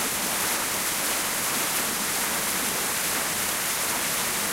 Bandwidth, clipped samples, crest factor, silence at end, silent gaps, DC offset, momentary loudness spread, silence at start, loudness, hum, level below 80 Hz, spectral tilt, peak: 16 kHz; under 0.1%; 14 dB; 0 s; none; under 0.1%; 1 LU; 0 s; -24 LUFS; none; -56 dBFS; -0.5 dB/octave; -12 dBFS